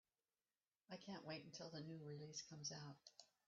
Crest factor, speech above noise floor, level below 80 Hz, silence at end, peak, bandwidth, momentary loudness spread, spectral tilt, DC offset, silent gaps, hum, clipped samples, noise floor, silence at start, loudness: 20 dB; over 35 dB; under -90 dBFS; 0.2 s; -38 dBFS; 7.4 kHz; 8 LU; -4.5 dB/octave; under 0.1%; none; none; under 0.1%; under -90 dBFS; 0.9 s; -55 LUFS